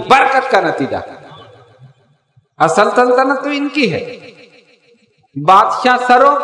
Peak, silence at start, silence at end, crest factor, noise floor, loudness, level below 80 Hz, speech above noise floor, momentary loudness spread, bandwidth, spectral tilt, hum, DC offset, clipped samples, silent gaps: 0 dBFS; 0 s; 0 s; 14 dB; -55 dBFS; -12 LUFS; -58 dBFS; 43 dB; 15 LU; 12 kHz; -4.5 dB/octave; none; under 0.1%; 0.6%; none